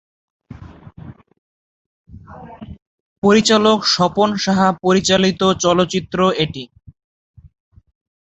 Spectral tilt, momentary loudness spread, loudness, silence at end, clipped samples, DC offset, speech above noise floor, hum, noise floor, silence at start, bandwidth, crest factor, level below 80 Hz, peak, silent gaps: -4.5 dB/octave; 24 LU; -15 LUFS; 1.65 s; under 0.1%; under 0.1%; 24 dB; none; -39 dBFS; 0.5 s; 8.2 kHz; 18 dB; -48 dBFS; -2 dBFS; 1.38-2.05 s, 2.82-3.22 s